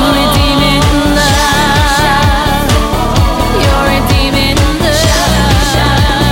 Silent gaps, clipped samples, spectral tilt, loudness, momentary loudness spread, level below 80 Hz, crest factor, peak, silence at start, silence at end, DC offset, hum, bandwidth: none; under 0.1%; -4.5 dB/octave; -9 LUFS; 2 LU; -16 dBFS; 8 dB; 0 dBFS; 0 s; 0 s; under 0.1%; none; 17 kHz